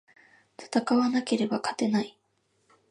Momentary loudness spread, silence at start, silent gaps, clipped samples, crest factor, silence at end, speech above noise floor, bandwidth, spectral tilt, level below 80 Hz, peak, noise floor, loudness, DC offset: 8 LU; 0.6 s; none; under 0.1%; 18 dB; 0.8 s; 45 dB; 11 kHz; -5 dB/octave; -76 dBFS; -10 dBFS; -72 dBFS; -27 LUFS; under 0.1%